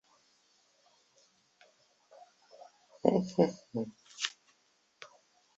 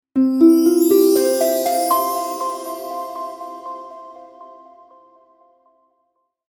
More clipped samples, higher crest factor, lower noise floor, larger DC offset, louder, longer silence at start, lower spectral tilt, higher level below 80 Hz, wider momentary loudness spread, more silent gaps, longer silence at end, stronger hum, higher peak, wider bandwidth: neither; first, 30 dB vs 18 dB; about the same, -72 dBFS vs -69 dBFS; neither; second, -33 LUFS vs -17 LUFS; first, 3.05 s vs 0.15 s; first, -5 dB/octave vs -3.5 dB/octave; second, -76 dBFS vs -70 dBFS; first, 27 LU vs 20 LU; neither; second, 0.5 s vs 1.95 s; neither; second, -8 dBFS vs -2 dBFS; second, 8 kHz vs 19 kHz